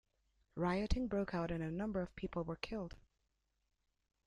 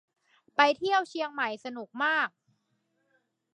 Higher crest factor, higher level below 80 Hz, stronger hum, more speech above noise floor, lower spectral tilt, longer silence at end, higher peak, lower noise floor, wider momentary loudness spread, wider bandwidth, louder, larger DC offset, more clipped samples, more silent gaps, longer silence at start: about the same, 20 dB vs 24 dB; first, -52 dBFS vs -84 dBFS; neither; about the same, 44 dB vs 47 dB; first, -7 dB/octave vs -2.5 dB/octave; about the same, 1.3 s vs 1.3 s; second, -22 dBFS vs -8 dBFS; first, -84 dBFS vs -76 dBFS; second, 7 LU vs 10 LU; about the same, 10.5 kHz vs 10 kHz; second, -41 LUFS vs -28 LUFS; neither; neither; neither; about the same, 0.55 s vs 0.6 s